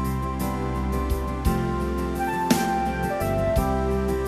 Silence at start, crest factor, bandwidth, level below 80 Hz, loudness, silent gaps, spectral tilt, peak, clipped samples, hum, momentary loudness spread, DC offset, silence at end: 0 s; 18 dB; 14 kHz; -30 dBFS; -25 LUFS; none; -6 dB/octave; -6 dBFS; under 0.1%; none; 5 LU; under 0.1%; 0 s